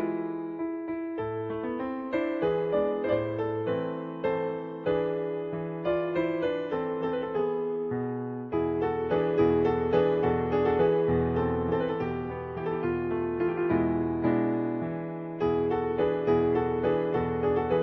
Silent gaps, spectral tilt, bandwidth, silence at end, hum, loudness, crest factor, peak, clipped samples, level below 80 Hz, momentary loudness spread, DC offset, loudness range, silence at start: none; -10 dB/octave; 5.8 kHz; 0 s; none; -29 LUFS; 14 dB; -12 dBFS; under 0.1%; -52 dBFS; 8 LU; under 0.1%; 4 LU; 0 s